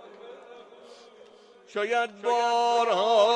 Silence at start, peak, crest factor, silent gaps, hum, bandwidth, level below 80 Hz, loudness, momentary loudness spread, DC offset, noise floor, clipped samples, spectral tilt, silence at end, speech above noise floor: 0.05 s; -8 dBFS; 18 dB; none; none; 9.6 kHz; under -90 dBFS; -25 LUFS; 24 LU; under 0.1%; -53 dBFS; under 0.1%; -2 dB/octave; 0 s; 29 dB